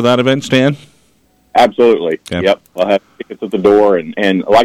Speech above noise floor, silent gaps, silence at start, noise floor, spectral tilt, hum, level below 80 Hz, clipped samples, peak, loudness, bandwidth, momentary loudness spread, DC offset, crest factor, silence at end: 42 dB; none; 0 s; -54 dBFS; -6 dB/octave; none; -50 dBFS; under 0.1%; -2 dBFS; -13 LUFS; 15.5 kHz; 9 LU; under 0.1%; 12 dB; 0 s